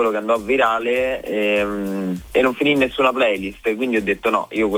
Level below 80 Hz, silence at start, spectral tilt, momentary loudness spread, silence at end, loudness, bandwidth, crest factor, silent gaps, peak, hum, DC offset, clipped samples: -46 dBFS; 0 s; -5.5 dB/octave; 6 LU; 0 s; -19 LUFS; 19.5 kHz; 16 dB; none; -4 dBFS; none; under 0.1%; under 0.1%